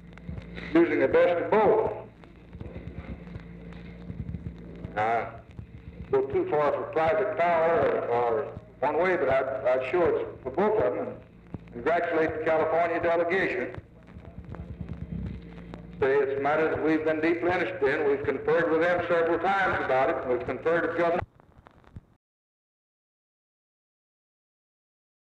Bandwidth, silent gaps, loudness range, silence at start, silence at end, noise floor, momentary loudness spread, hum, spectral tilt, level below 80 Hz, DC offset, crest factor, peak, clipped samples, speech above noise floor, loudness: 8 kHz; none; 8 LU; 0.05 s; 3.35 s; -56 dBFS; 20 LU; none; -7.5 dB/octave; -50 dBFS; under 0.1%; 16 dB; -12 dBFS; under 0.1%; 30 dB; -26 LUFS